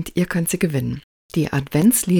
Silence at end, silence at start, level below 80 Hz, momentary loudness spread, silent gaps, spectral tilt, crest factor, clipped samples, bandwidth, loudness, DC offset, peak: 0 s; 0 s; -46 dBFS; 11 LU; 1.04-1.29 s; -5.5 dB/octave; 14 dB; under 0.1%; 18 kHz; -20 LUFS; under 0.1%; -6 dBFS